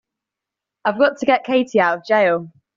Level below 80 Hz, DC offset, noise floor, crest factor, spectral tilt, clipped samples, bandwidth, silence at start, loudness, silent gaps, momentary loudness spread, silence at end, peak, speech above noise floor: -66 dBFS; under 0.1%; -85 dBFS; 16 dB; -3 dB/octave; under 0.1%; 7.6 kHz; 0.85 s; -18 LUFS; none; 8 LU; 0.3 s; -2 dBFS; 68 dB